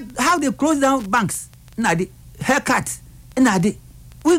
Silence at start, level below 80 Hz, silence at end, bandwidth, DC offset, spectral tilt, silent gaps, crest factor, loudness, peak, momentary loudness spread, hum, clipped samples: 0 s; -46 dBFS; 0 s; 16.5 kHz; under 0.1%; -4.5 dB/octave; none; 14 dB; -20 LUFS; -6 dBFS; 12 LU; none; under 0.1%